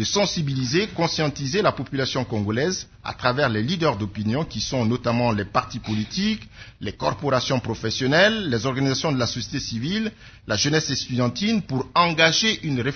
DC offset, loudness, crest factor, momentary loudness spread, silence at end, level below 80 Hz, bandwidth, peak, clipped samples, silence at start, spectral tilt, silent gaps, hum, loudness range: under 0.1%; -23 LUFS; 20 dB; 9 LU; 0 s; -48 dBFS; 6.6 kHz; -2 dBFS; under 0.1%; 0 s; -4.5 dB/octave; none; none; 3 LU